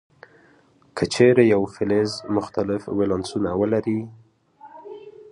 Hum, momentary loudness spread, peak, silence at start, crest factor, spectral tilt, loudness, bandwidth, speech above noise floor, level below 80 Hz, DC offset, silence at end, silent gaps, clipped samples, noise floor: none; 24 LU; -2 dBFS; 0.95 s; 20 dB; -6 dB/octave; -21 LUFS; 11 kHz; 36 dB; -52 dBFS; under 0.1%; 0 s; none; under 0.1%; -57 dBFS